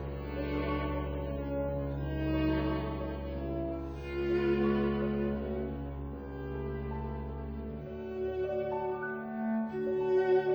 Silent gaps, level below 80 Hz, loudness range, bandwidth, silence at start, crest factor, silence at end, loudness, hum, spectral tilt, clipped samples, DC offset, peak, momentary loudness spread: none; -42 dBFS; 5 LU; over 20 kHz; 0 s; 14 dB; 0 s; -34 LUFS; none; -9.5 dB/octave; under 0.1%; under 0.1%; -18 dBFS; 11 LU